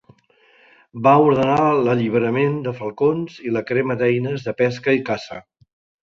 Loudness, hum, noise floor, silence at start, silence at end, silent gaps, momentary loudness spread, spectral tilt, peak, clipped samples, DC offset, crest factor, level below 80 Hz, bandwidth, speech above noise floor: -19 LUFS; none; -56 dBFS; 0.95 s; 0.6 s; none; 12 LU; -8 dB/octave; -2 dBFS; under 0.1%; under 0.1%; 18 dB; -58 dBFS; 7.4 kHz; 37 dB